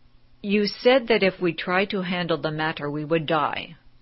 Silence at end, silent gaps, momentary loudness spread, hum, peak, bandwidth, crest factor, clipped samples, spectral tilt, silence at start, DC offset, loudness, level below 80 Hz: 0.25 s; none; 9 LU; none; -6 dBFS; 6 kHz; 18 dB; under 0.1%; -8.5 dB/octave; 0.45 s; under 0.1%; -23 LUFS; -56 dBFS